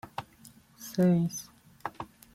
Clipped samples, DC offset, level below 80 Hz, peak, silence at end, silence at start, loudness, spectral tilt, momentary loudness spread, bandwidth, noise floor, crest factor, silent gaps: under 0.1%; under 0.1%; -66 dBFS; -16 dBFS; 0.3 s; 0.05 s; -29 LUFS; -6.5 dB/octave; 22 LU; 15.5 kHz; -56 dBFS; 16 dB; none